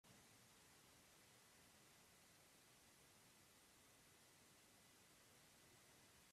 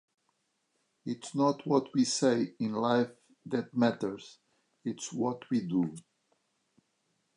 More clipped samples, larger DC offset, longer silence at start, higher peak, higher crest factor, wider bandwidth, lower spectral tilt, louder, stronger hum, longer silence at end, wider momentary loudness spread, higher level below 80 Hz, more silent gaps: neither; neither; second, 0.05 s vs 1.05 s; second, -56 dBFS vs -14 dBFS; about the same, 16 dB vs 20 dB; first, 15 kHz vs 11 kHz; second, -2 dB/octave vs -5 dB/octave; second, -69 LUFS vs -31 LUFS; neither; second, 0 s vs 1.35 s; second, 1 LU vs 13 LU; second, under -90 dBFS vs -78 dBFS; neither